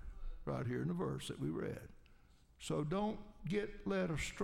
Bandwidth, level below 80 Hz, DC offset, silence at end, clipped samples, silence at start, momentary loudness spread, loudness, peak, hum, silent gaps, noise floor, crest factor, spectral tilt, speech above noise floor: 16 kHz; -54 dBFS; under 0.1%; 0 s; under 0.1%; 0 s; 12 LU; -41 LUFS; -26 dBFS; none; none; -65 dBFS; 16 dB; -6 dB/octave; 25 dB